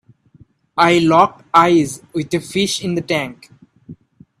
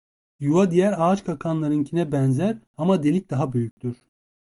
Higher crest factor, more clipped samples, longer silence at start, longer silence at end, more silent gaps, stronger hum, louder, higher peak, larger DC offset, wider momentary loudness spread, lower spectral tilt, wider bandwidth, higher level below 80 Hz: about the same, 18 dB vs 16 dB; neither; first, 0.75 s vs 0.4 s; about the same, 0.45 s vs 0.5 s; second, none vs 2.67-2.74 s, 3.71-3.77 s; neither; first, -16 LUFS vs -22 LUFS; first, 0 dBFS vs -6 dBFS; neither; about the same, 11 LU vs 10 LU; second, -4.5 dB/octave vs -8 dB/octave; first, 13.5 kHz vs 11.5 kHz; about the same, -56 dBFS vs -58 dBFS